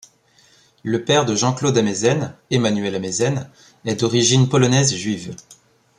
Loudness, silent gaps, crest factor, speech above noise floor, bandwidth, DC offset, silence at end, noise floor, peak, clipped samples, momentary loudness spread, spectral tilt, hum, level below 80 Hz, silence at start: -18 LUFS; none; 18 dB; 37 dB; 11 kHz; under 0.1%; 0.45 s; -55 dBFS; -2 dBFS; under 0.1%; 14 LU; -4.5 dB/octave; none; -56 dBFS; 0.85 s